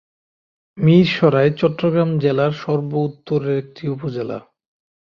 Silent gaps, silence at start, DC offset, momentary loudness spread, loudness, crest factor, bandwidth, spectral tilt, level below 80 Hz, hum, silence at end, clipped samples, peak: none; 0.75 s; under 0.1%; 12 LU; -18 LUFS; 16 dB; 6.6 kHz; -8.5 dB/octave; -58 dBFS; none; 0.75 s; under 0.1%; -2 dBFS